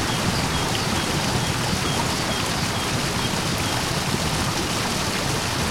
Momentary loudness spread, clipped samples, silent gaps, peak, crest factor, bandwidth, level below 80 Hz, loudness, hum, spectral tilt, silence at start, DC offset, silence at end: 1 LU; under 0.1%; none; -8 dBFS; 14 dB; 16.5 kHz; -38 dBFS; -22 LUFS; none; -3.5 dB/octave; 0 s; under 0.1%; 0 s